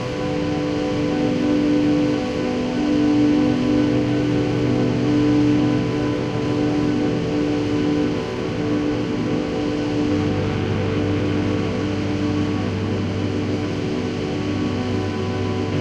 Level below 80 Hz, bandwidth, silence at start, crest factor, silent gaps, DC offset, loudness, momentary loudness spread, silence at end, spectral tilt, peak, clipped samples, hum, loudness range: -42 dBFS; 9 kHz; 0 s; 12 dB; none; under 0.1%; -21 LUFS; 5 LU; 0 s; -7 dB/octave; -6 dBFS; under 0.1%; none; 4 LU